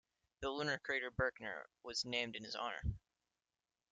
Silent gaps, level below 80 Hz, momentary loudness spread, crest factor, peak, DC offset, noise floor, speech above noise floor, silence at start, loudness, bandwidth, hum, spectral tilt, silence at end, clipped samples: none; -58 dBFS; 9 LU; 22 dB; -22 dBFS; under 0.1%; under -90 dBFS; over 48 dB; 0.4 s; -42 LUFS; 9.4 kHz; none; -4 dB/octave; 0.95 s; under 0.1%